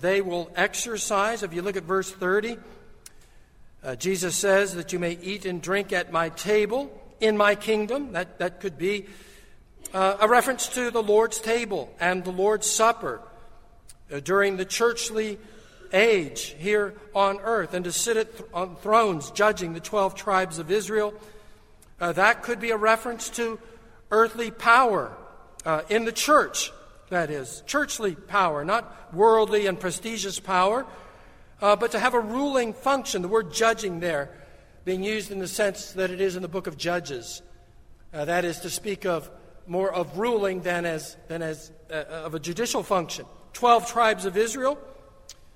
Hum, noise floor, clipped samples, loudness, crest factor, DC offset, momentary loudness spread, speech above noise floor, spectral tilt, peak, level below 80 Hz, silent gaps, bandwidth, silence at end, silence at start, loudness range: none; -51 dBFS; under 0.1%; -25 LUFS; 22 dB; under 0.1%; 12 LU; 26 dB; -3 dB/octave; -4 dBFS; -54 dBFS; none; 16 kHz; 0.25 s; 0 s; 6 LU